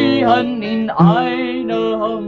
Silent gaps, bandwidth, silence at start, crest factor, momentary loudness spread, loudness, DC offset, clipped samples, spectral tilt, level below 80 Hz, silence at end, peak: none; 5.8 kHz; 0 s; 14 dB; 7 LU; -16 LUFS; under 0.1%; under 0.1%; -8.5 dB/octave; -50 dBFS; 0 s; -2 dBFS